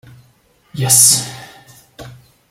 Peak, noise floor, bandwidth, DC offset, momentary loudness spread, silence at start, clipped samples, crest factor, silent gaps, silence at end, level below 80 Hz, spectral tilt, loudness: 0 dBFS; -54 dBFS; over 20 kHz; under 0.1%; 25 LU; 0.75 s; under 0.1%; 18 dB; none; 0.4 s; -54 dBFS; -1.5 dB/octave; -10 LUFS